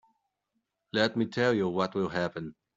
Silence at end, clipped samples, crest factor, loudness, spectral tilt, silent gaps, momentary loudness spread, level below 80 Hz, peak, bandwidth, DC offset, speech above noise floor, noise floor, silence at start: 0.25 s; under 0.1%; 20 dB; -29 LUFS; -6 dB/octave; none; 7 LU; -68 dBFS; -10 dBFS; 7.8 kHz; under 0.1%; 52 dB; -81 dBFS; 0.95 s